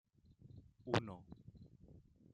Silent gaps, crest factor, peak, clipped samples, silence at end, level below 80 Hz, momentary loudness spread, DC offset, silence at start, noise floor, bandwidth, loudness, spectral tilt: none; 28 dB; -20 dBFS; under 0.1%; 0.35 s; -70 dBFS; 24 LU; under 0.1%; 0.3 s; -64 dBFS; 9.6 kHz; -43 LUFS; -6 dB/octave